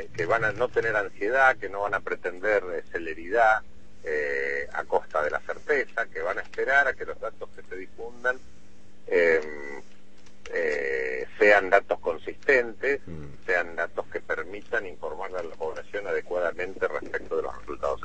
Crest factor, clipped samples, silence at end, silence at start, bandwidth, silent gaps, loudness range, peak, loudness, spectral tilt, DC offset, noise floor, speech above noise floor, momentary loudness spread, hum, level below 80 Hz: 22 dB; under 0.1%; 0 s; 0 s; 8.6 kHz; none; 7 LU; -4 dBFS; -27 LUFS; -5 dB/octave; 1%; -56 dBFS; 29 dB; 14 LU; none; -56 dBFS